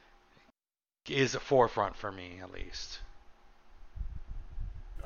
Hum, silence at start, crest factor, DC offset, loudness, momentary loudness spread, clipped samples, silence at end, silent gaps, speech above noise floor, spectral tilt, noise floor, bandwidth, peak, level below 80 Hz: none; 1.05 s; 24 dB; under 0.1%; -33 LUFS; 21 LU; under 0.1%; 0 s; none; over 58 dB; -4.5 dB/octave; under -90 dBFS; 7.4 kHz; -12 dBFS; -46 dBFS